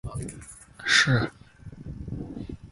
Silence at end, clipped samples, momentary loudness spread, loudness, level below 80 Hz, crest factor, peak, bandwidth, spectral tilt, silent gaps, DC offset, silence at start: 0 s; under 0.1%; 24 LU; -24 LUFS; -46 dBFS; 24 dB; -6 dBFS; 11.5 kHz; -3.5 dB/octave; none; under 0.1%; 0.05 s